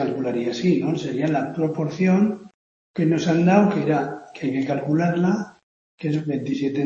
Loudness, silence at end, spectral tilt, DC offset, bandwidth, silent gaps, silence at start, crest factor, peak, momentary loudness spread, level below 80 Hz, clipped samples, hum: -22 LUFS; 0 s; -7.5 dB/octave; under 0.1%; 7.4 kHz; 2.54-2.94 s, 5.63-5.98 s; 0 s; 18 dB; -2 dBFS; 9 LU; -64 dBFS; under 0.1%; none